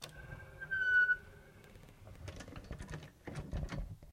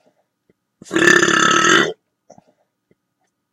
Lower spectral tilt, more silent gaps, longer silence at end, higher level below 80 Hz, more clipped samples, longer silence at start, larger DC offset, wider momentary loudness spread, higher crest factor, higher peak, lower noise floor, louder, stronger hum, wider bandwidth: first, -4.5 dB/octave vs -2 dB/octave; neither; second, 0 s vs 1.6 s; first, -52 dBFS vs -58 dBFS; neither; second, 0 s vs 0.9 s; neither; first, 27 LU vs 9 LU; about the same, 18 dB vs 18 dB; second, -22 dBFS vs 0 dBFS; second, -57 dBFS vs -71 dBFS; second, -35 LUFS vs -13 LUFS; neither; about the same, 16 kHz vs 16.5 kHz